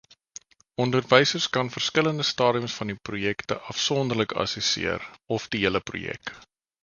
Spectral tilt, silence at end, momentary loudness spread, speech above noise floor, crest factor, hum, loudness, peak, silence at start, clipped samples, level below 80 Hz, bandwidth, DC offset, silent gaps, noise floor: -4 dB/octave; 0.45 s; 16 LU; 23 dB; 26 dB; none; -25 LUFS; -2 dBFS; 0.8 s; under 0.1%; -56 dBFS; 7.4 kHz; under 0.1%; none; -49 dBFS